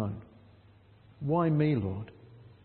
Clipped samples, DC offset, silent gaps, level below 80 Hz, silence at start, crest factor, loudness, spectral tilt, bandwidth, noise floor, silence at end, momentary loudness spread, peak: under 0.1%; under 0.1%; none; -62 dBFS; 0 s; 18 dB; -30 LUFS; -12 dB/octave; 4.4 kHz; -58 dBFS; 0.2 s; 18 LU; -14 dBFS